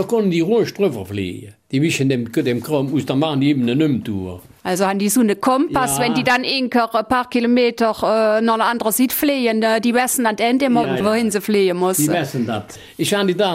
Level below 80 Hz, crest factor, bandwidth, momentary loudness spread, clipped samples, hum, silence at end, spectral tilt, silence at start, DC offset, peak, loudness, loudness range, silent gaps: -54 dBFS; 14 dB; 16 kHz; 8 LU; under 0.1%; none; 0 s; -4.5 dB/octave; 0 s; under 0.1%; -4 dBFS; -18 LUFS; 3 LU; none